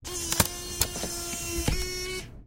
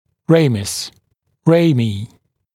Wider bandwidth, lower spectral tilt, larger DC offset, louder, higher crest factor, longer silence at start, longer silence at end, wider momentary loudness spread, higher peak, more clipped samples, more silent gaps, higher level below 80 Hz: about the same, 17 kHz vs 15.5 kHz; second, -2.5 dB/octave vs -6 dB/octave; neither; second, -29 LUFS vs -16 LUFS; first, 26 dB vs 18 dB; second, 0 s vs 0.3 s; second, 0 s vs 0.5 s; second, 6 LU vs 16 LU; second, -4 dBFS vs 0 dBFS; neither; neither; first, -38 dBFS vs -56 dBFS